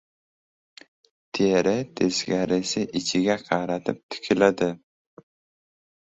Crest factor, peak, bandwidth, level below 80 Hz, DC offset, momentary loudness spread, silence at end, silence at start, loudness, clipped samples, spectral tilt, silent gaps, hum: 22 dB; -4 dBFS; 8.2 kHz; -60 dBFS; under 0.1%; 9 LU; 1.25 s; 1.35 s; -24 LUFS; under 0.1%; -4.5 dB/octave; 4.03-4.09 s; none